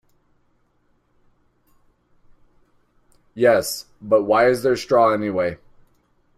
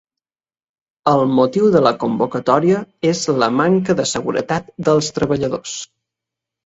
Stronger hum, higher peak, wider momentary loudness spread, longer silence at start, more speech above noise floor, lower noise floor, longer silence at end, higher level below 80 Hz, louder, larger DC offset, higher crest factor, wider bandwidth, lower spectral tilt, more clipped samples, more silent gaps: first, 60 Hz at -55 dBFS vs none; second, -4 dBFS vs 0 dBFS; first, 13 LU vs 8 LU; first, 3.35 s vs 1.05 s; second, 46 dB vs over 74 dB; second, -64 dBFS vs under -90 dBFS; about the same, 0.8 s vs 0.8 s; second, -58 dBFS vs -52 dBFS; about the same, -19 LUFS vs -17 LUFS; neither; about the same, 20 dB vs 18 dB; first, 15.5 kHz vs 8.2 kHz; about the same, -4.5 dB/octave vs -5.5 dB/octave; neither; neither